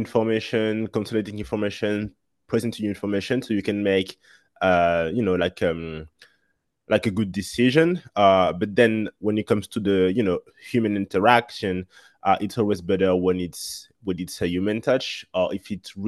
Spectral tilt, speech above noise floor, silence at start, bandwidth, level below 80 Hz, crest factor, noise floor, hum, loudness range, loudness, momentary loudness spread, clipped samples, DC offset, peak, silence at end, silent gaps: -6 dB/octave; 50 dB; 0 s; 12.5 kHz; -54 dBFS; 22 dB; -73 dBFS; none; 5 LU; -23 LUFS; 11 LU; under 0.1%; under 0.1%; 0 dBFS; 0 s; none